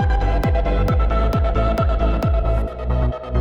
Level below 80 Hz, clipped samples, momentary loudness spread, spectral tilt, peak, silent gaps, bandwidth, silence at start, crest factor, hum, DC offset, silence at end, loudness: -20 dBFS; under 0.1%; 3 LU; -8.5 dB/octave; -8 dBFS; none; 6.6 kHz; 0 s; 8 dB; none; under 0.1%; 0 s; -20 LUFS